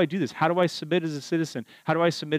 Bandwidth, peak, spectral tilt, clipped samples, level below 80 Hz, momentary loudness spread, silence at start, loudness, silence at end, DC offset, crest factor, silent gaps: 15 kHz; -10 dBFS; -6 dB/octave; under 0.1%; -80 dBFS; 6 LU; 0 s; -26 LUFS; 0 s; under 0.1%; 16 dB; none